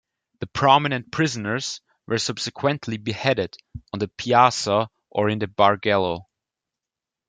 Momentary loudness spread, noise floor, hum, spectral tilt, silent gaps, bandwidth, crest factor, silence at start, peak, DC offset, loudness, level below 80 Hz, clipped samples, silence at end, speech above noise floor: 14 LU; -88 dBFS; none; -4.5 dB/octave; none; 9.6 kHz; 22 dB; 0.4 s; -2 dBFS; under 0.1%; -22 LUFS; -58 dBFS; under 0.1%; 1.05 s; 66 dB